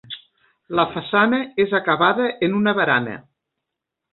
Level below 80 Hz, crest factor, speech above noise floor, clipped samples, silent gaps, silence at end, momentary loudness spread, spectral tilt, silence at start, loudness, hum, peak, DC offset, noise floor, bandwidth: -62 dBFS; 18 dB; 63 dB; under 0.1%; none; 0.95 s; 14 LU; -10 dB/octave; 0.1 s; -19 LUFS; none; -2 dBFS; under 0.1%; -82 dBFS; 4.3 kHz